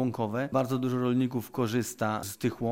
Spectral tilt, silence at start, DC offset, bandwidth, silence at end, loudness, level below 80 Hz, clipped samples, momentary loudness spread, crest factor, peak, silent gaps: -6 dB/octave; 0 s; under 0.1%; 16.5 kHz; 0 s; -30 LUFS; -64 dBFS; under 0.1%; 4 LU; 16 dB; -14 dBFS; none